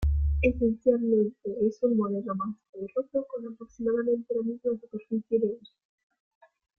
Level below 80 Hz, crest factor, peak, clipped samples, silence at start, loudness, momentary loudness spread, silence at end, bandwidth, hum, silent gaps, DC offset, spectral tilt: -38 dBFS; 18 dB; -10 dBFS; under 0.1%; 0 s; -29 LUFS; 11 LU; 1.2 s; 6.6 kHz; none; 2.69-2.73 s; under 0.1%; -10 dB/octave